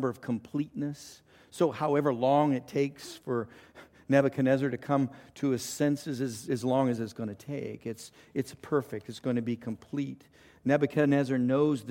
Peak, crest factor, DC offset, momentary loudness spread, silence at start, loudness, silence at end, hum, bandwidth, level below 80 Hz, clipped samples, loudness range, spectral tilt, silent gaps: -10 dBFS; 20 dB; under 0.1%; 13 LU; 0 s; -30 LUFS; 0 s; none; 16.5 kHz; -70 dBFS; under 0.1%; 5 LU; -6.5 dB/octave; none